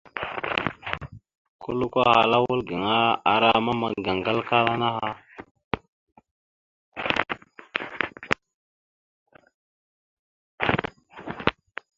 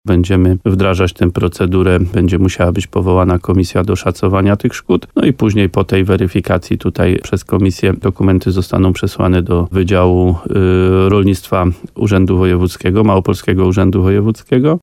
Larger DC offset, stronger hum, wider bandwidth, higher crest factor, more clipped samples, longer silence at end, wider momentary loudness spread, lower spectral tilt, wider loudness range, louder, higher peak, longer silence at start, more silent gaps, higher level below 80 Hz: neither; neither; second, 7.8 kHz vs 14 kHz; first, 26 dB vs 12 dB; neither; first, 0.45 s vs 0.05 s; first, 16 LU vs 4 LU; second, -6 dB/octave vs -7.5 dB/octave; first, 11 LU vs 2 LU; second, -24 LUFS vs -13 LUFS; about the same, 0 dBFS vs 0 dBFS; about the same, 0.15 s vs 0.05 s; first, 1.38-1.59 s, 5.51-5.55 s, 5.64-5.71 s, 5.88-6.07 s, 6.31-6.92 s, 8.54-9.26 s, 9.54-10.58 s vs none; second, -54 dBFS vs -32 dBFS